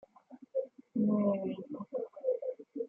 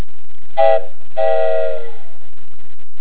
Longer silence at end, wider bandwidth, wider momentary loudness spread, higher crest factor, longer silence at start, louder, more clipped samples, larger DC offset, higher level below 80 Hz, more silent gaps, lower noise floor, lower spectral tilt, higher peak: second, 0 s vs 1.1 s; second, 3.3 kHz vs 4 kHz; second, 11 LU vs 15 LU; about the same, 16 dB vs 18 dB; second, 0.3 s vs 0.55 s; second, -35 LUFS vs -18 LUFS; neither; second, under 0.1% vs 40%; second, -82 dBFS vs -58 dBFS; neither; first, -57 dBFS vs -38 dBFS; first, -11.5 dB/octave vs -7.5 dB/octave; second, -20 dBFS vs 0 dBFS